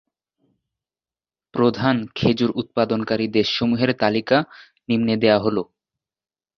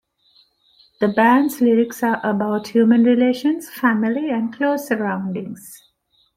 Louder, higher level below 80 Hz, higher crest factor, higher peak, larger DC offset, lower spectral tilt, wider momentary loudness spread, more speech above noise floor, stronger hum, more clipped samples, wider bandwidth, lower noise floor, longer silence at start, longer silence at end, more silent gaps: about the same, -20 LUFS vs -18 LUFS; first, -54 dBFS vs -64 dBFS; about the same, 20 dB vs 16 dB; about the same, -2 dBFS vs -2 dBFS; neither; about the same, -7 dB/octave vs -6 dB/octave; about the same, 9 LU vs 9 LU; first, over 70 dB vs 45 dB; neither; neither; second, 6.6 kHz vs 16 kHz; first, under -90 dBFS vs -63 dBFS; first, 1.55 s vs 1 s; first, 0.95 s vs 0.6 s; neither